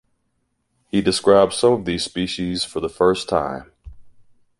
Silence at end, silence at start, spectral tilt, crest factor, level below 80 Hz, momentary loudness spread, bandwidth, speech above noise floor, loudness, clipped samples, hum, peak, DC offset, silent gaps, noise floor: 0.5 s; 0.95 s; -4.5 dB/octave; 20 dB; -46 dBFS; 9 LU; 11.5 kHz; 51 dB; -19 LUFS; under 0.1%; none; -2 dBFS; under 0.1%; none; -70 dBFS